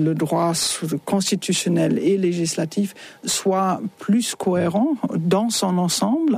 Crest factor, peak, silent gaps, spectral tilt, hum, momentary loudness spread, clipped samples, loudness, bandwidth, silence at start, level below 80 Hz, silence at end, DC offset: 14 dB; -8 dBFS; none; -4.5 dB/octave; none; 5 LU; under 0.1%; -21 LUFS; 15.5 kHz; 0 s; -62 dBFS; 0 s; under 0.1%